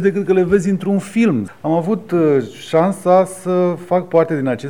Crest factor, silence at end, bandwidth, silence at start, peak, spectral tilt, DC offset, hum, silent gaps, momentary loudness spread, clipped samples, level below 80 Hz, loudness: 14 dB; 0 s; 13 kHz; 0 s; -2 dBFS; -7.5 dB/octave; 0.5%; none; none; 5 LU; under 0.1%; -52 dBFS; -16 LUFS